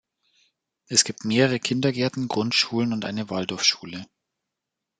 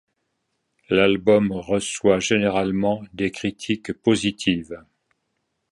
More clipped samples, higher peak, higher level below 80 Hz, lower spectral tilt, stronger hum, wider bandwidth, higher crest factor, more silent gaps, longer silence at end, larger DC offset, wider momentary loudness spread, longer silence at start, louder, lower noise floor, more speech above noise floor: neither; about the same, -2 dBFS vs -4 dBFS; second, -68 dBFS vs -52 dBFS; second, -3.5 dB/octave vs -5 dB/octave; neither; second, 10 kHz vs 11.5 kHz; about the same, 24 dB vs 20 dB; neither; about the same, 0.95 s vs 0.9 s; neither; about the same, 8 LU vs 9 LU; about the same, 0.9 s vs 0.9 s; about the same, -23 LUFS vs -21 LUFS; first, -84 dBFS vs -75 dBFS; first, 61 dB vs 54 dB